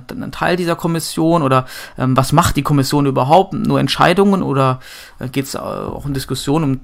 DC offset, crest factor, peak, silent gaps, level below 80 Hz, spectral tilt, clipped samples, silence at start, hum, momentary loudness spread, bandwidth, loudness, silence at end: under 0.1%; 16 dB; 0 dBFS; none; -36 dBFS; -5.5 dB/octave; under 0.1%; 0 s; none; 12 LU; 16.5 kHz; -16 LUFS; 0 s